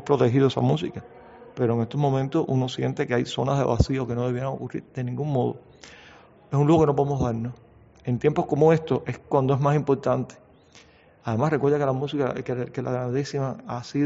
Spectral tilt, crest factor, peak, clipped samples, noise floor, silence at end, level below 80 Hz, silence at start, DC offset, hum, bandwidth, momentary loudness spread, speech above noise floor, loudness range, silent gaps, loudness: -7 dB/octave; 20 dB; -4 dBFS; under 0.1%; -53 dBFS; 0 s; -48 dBFS; 0 s; under 0.1%; none; 8 kHz; 12 LU; 30 dB; 3 LU; none; -24 LUFS